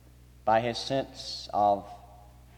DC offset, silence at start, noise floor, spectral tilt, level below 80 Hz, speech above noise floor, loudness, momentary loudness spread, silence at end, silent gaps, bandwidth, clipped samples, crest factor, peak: under 0.1%; 0.45 s; -52 dBFS; -4.5 dB/octave; -56 dBFS; 24 dB; -29 LUFS; 13 LU; 0.35 s; none; 16.5 kHz; under 0.1%; 18 dB; -12 dBFS